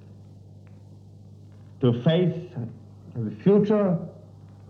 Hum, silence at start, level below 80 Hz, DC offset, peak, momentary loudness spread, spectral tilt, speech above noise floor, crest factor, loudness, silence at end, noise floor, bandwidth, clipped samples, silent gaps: 50 Hz at -45 dBFS; 0.05 s; -66 dBFS; under 0.1%; -8 dBFS; 19 LU; -9.5 dB/octave; 24 dB; 18 dB; -24 LUFS; 0.25 s; -47 dBFS; 6.2 kHz; under 0.1%; none